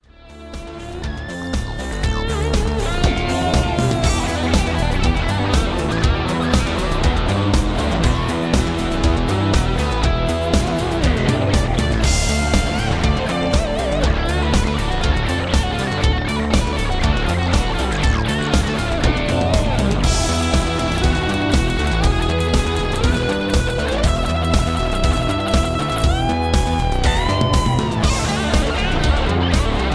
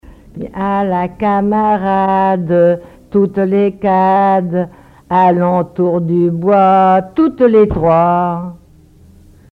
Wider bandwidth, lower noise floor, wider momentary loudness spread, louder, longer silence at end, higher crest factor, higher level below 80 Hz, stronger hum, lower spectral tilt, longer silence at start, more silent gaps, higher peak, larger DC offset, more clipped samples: first, 11 kHz vs 5 kHz; second, -39 dBFS vs -43 dBFS; second, 3 LU vs 9 LU; second, -19 LUFS vs -13 LUFS; second, 0 s vs 0.95 s; about the same, 16 dB vs 12 dB; first, -22 dBFS vs -40 dBFS; neither; second, -5 dB/octave vs -10 dB/octave; first, 0.25 s vs 0.1 s; neither; about the same, -2 dBFS vs 0 dBFS; first, 0.3% vs under 0.1%; neither